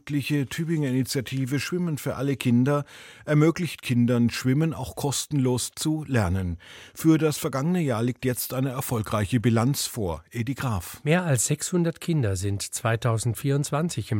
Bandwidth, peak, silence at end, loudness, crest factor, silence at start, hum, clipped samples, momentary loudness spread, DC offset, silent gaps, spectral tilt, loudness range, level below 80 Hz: 17 kHz; -8 dBFS; 0 s; -25 LUFS; 16 dB; 0.05 s; none; under 0.1%; 7 LU; under 0.1%; none; -5.5 dB/octave; 2 LU; -52 dBFS